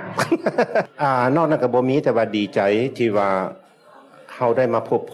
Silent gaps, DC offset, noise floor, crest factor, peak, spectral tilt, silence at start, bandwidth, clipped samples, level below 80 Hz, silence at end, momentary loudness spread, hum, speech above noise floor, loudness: none; under 0.1%; -48 dBFS; 14 dB; -6 dBFS; -6.5 dB/octave; 0 s; 13 kHz; under 0.1%; -72 dBFS; 0 s; 4 LU; none; 29 dB; -20 LUFS